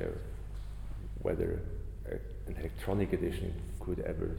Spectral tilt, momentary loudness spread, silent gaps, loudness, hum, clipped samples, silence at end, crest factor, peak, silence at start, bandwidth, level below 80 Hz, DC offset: -8 dB/octave; 12 LU; none; -38 LUFS; 50 Hz at -40 dBFS; under 0.1%; 0 s; 18 dB; -18 dBFS; 0 s; 16.5 kHz; -42 dBFS; under 0.1%